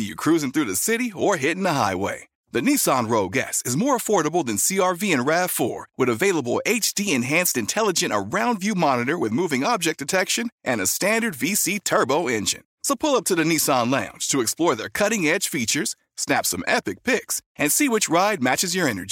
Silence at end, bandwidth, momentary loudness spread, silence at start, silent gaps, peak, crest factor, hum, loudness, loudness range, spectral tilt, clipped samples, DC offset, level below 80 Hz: 0 s; 17 kHz; 4 LU; 0 s; 2.35-2.44 s, 10.52-10.58 s, 12.65-12.78 s, 17.46-17.55 s; -4 dBFS; 18 dB; none; -21 LUFS; 1 LU; -3 dB/octave; under 0.1%; under 0.1%; -62 dBFS